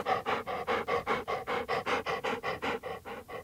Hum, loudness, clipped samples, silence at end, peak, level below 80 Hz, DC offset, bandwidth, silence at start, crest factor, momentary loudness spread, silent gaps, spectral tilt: none; -33 LUFS; under 0.1%; 0 s; -18 dBFS; -62 dBFS; under 0.1%; 16 kHz; 0 s; 16 dB; 7 LU; none; -4 dB/octave